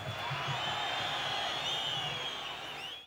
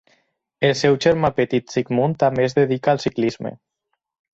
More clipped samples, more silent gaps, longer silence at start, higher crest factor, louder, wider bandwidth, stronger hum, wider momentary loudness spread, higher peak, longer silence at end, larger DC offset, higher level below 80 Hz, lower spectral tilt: neither; neither; second, 0 s vs 0.6 s; about the same, 14 dB vs 18 dB; second, -34 LUFS vs -19 LUFS; first, over 20 kHz vs 8 kHz; neither; about the same, 6 LU vs 6 LU; second, -22 dBFS vs -4 dBFS; second, 0 s vs 0.8 s; neither; second, -66 dBFS vs -54 dBFS; second, -2.5 dB/octave vs -6 dB/octave